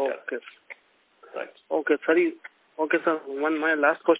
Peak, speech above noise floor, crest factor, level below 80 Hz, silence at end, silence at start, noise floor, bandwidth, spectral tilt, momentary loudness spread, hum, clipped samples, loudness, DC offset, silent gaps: -8 dBFS; 38 dB; 18 dB; -82 dBFS; 0 s; 0 s; -63 dBFS; 4 kHz; -8 dB/octave; 22 LU; none; under 0.1%; -25 LUFS; under 0.1%; none